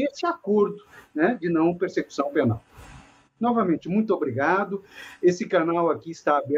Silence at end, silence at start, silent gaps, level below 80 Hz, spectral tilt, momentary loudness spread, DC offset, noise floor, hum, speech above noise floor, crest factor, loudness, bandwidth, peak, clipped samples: 0 s; 0 s; none; -60 dBFS; -7 dB/octave; 7 LU; under 0.1%; -50 dBFS; none; 26 dB; 16 dB; -24 LUFS; 8 kHz; -8 dBFS; under 0.1%